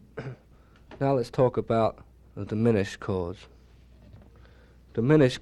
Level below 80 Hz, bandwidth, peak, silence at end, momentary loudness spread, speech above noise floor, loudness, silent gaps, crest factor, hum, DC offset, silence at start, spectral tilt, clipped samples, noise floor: -52 dBFS; 12 kHz; -8 dBFS; 0 s; 18 LU; 31 dB; -26 LUFS; none; 20 dB; none; under 0.1%; 0.15 s; -7.5 dB/octave; under 0.1%; -55 dBFS